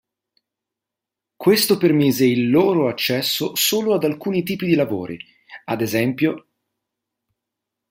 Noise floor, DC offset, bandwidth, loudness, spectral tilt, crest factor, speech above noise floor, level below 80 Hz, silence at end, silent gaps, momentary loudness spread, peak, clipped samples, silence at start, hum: -85 dBFS; under 0.1%; 16 kHz; -19 LUFS; -4.5 dB/octave; 18 dB; 67 dB; -62 dBFS; 1.5 s; none; 12 LU; -2 dBFS; under 0.1%; 1.4 s; none